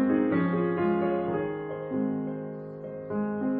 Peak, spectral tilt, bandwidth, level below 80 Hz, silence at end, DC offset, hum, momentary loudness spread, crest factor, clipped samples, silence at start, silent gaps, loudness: -14 dBFS; -12 dB/octave; 4.2 kHz; -62 dBFS; 0 s; under 0.1%; none; 13 LU; 14 dB; under 0.1%; 0 s; none; -29 LUFS